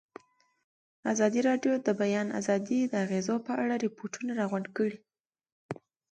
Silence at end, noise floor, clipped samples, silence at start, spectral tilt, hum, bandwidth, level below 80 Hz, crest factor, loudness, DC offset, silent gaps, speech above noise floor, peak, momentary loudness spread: 0.35 s; -54 dBFS; under 0.1%; 1.05 s; -5.5 dB/octave; none; 9.2 kHz; -78 dBFS; 16 dB; -30 LUFS; under 0.1%; 5.20-5.24 s, 5.52-5.69 s; 25 dB; -14 dBFS; 13 LU